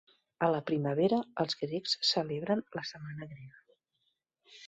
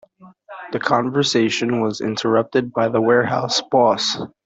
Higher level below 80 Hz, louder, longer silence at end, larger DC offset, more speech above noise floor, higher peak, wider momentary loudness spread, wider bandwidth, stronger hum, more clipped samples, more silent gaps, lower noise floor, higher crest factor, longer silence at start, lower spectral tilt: second, -74 dBFS vs -60 dBFS; second, -32 LUFS vs -18 LUFS; second, 0 s vs 0.2 s; neither; first, 47 dB vs 25 dB; second, -16 dBFS vs -2 dBFS; first, 15 LU vs 6 LU; about the same, 8.4 kHz vs 8 kHz; neither; neither; neither; first, -80 dBFS vs -43 dBFS; about the same, 20 dB vs 16 dB; first, 0.4 s vs 0.2 s; about the same, -5 dB/octave vs -4.5 dB/octave